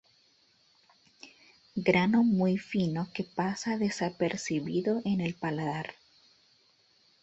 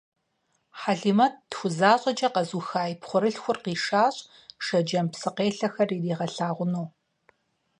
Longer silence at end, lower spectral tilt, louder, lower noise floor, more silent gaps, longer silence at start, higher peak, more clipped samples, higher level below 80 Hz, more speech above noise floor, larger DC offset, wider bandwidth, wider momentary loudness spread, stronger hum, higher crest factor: first, 1.3 s vs 0.9 s; about the same, -6 dB/octave vs -5.5 dB/octave; second, -30 LUFS vs -26 LUFS; second, -66 dBFS vs -73 dBFS; neither; first, 1.25 s vs 0.75 s; second, -10 dBFS vs -6 dBFS; neither; first, -66 dBFS vs -74 dBFS; second, 37 dB vs 48 dB; neither; second, 8.2 kHz vs 10.5 kHz; about the same, 10 LU vs 9 LU; neither; about the same, 22 dB vs 20 dB